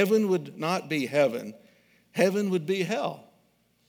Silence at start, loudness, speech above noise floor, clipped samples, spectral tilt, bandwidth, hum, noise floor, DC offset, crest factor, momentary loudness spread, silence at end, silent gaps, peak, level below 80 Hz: 0 s; -27 LUFS; 41 dB; under 0.1%; -5.5 dB/octave; 19.5 kHz; none; -67 dBFS; under 0.1%; 20 dB; 12 LU; 0.65 s; none; -8 dBFS; -82 dBFS